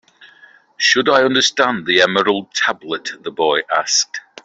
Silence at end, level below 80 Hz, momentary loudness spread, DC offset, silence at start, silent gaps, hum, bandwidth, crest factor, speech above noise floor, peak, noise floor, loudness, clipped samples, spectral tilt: 0.25 s; -62 dBFS; 11 LU; under 0.1%; 0.2 s; none; none; 8.2 kHz; 16 dB; 31 dB; -2 dBFS; -48 dBFS; -15 LUFS; under 0.1%; -1.5 dB/octave